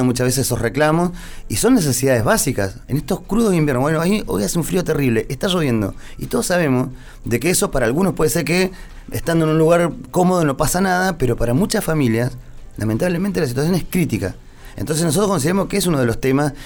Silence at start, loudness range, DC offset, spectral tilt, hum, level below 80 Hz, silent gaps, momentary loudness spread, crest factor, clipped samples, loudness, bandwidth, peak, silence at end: 0 s; 2 LU; under 0.1%; -5 dB/octave; none; -34 dBFS; none; 8 LU; 14 dB; under 0.1%; -18 LUFS; over 20 kHz; -4 dBFS; 0 s